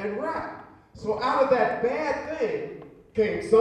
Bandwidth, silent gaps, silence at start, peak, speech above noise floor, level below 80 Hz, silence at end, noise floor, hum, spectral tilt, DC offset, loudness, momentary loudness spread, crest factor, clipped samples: 10 kHz; none; 0 s; -8 dBFS; 21 dB; -58 dBFS; 0 s; -45 dBFS; none; -6 dB/octave; under 0.1%; -26 LUFS; 16 LU; 18 dB; under 0.1%